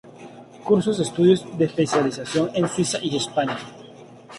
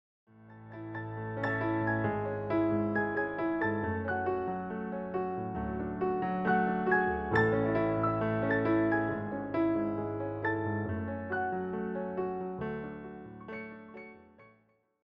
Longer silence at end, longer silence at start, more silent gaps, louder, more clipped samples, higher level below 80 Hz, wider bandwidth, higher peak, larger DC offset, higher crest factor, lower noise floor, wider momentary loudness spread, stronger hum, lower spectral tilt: second, 0 s vs 0.6 s; second, 0.05 s vs 0.35 s; neither; first, -22 LUFS vs -32 LUFS; neither; about the same, -60 dBFS vs -56 dBFS; first, 11.5 kHz vs 5.8 kHz; first, -6 dBFS vs -16 dBFS; neither; about the same, 18 dB vs 18 dB; second, -44 dBFS vs -69 dBFS; first, 19 LU vs 14 LU; neither; second, -5 dB/octave vs -6.5 dB/octave